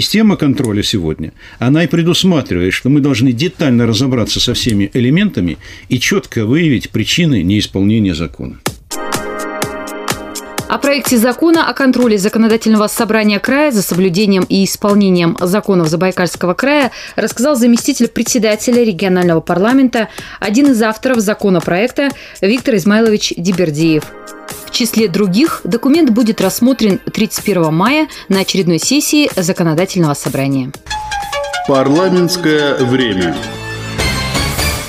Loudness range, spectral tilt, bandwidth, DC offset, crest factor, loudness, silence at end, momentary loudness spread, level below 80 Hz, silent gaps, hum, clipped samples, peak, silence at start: 3 LU; -5 dB/octave; 16 kHz; under 0.1%; 12 dB; -13 LUFS; 0 s; 9 LU; -36 dBFS; none; none; under 0.1%; 0 dBFS; 0 s